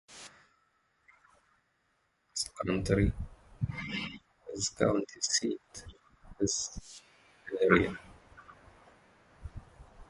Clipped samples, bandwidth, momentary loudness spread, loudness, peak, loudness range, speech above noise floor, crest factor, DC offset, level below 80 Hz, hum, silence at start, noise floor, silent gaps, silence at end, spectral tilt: under 0.1%; 11.5 kHz; 22 LU; -32 LUFS; -6 dBFS; 4 LU; 44 dB; 30 dB; under 0.1%; -48 dBFS; none; 0.1 s; -75 dBFS; none; 0.05 s; -4 dB/octave